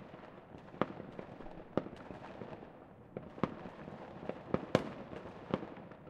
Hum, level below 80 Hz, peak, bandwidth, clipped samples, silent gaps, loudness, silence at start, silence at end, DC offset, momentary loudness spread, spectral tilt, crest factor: none; -66 dBFS; -10 dBFS; 11.5 kHz; under 0.1%; none; -43 LUFS; 0 s; 0 s; under 0.1%; 17 LU; -7 dB/octave; 32 dB